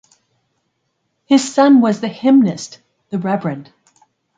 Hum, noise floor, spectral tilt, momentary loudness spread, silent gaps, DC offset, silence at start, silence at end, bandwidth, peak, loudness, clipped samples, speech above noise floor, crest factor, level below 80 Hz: none; -69 dBFS; -5.5 dB/octave; 17 LU; none; under 0.1%; 1.3 s; 0.75 s; 9.4 kHz; 0 dBFS; -15 LUFS; under 0.1%; 56 dB; 16 dB; -66 dBFS